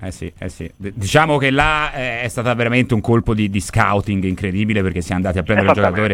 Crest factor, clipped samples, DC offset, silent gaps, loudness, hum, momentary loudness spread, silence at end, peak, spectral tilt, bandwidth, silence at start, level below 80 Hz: 18 dB; under 0.1%; under 0.1%; none; -17 LUFS; none; 15 LU; 0 s; 0 dBFS; -6 dB/octave; 15.5 kHz; 0 s; -36 dBFS